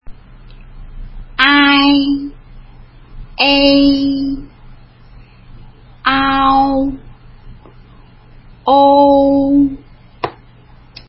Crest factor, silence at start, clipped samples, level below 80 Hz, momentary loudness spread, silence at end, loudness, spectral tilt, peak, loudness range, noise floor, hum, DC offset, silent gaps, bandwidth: 14 dB; 0.05 s; under 0.1%; -36 dBFS; 18 LU; 0.75 s; -11 LUFS; -7 dB/octave; 0 dBFS; 5 LU; -42 dBFS; none; under 0.1%; none; 5.8 kHz